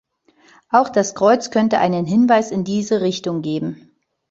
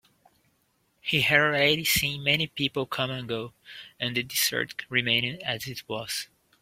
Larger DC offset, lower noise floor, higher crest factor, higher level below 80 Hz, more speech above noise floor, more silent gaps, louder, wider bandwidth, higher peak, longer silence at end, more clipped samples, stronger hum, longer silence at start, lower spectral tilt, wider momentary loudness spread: neither; second, -54 dBFS vs -70 dBFS; second, 16 dB vs 22 dB; about the same, -60 dBFS vs -58 dBFS; second, 37 dB vs 43 dB; neither; first, -18 LUFS vs -26 LUFS; second, 7.8 kHz vs 16.5 kHz; first, -2 dBFS vs -6 dBFS; first, 0.55 s vs 0.35 s; neither; neither; second, 0.7 s vs 1.05 s; first, -5.5 dB/octave vs -3 dB/octave; second, 8 LU vs 13 LU